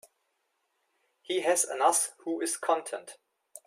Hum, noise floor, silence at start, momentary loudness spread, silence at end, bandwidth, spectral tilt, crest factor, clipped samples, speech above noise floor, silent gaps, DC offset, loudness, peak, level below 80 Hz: none; -78 dBFS; 1.3 s; 10 LU; 0.1 s; 16 kHz; -0.5 dB/octave; 20 dB; under 0.1%; 49 dB; none; under 0.1%; -28 LUFS; -12 dBFS; -84 dBFS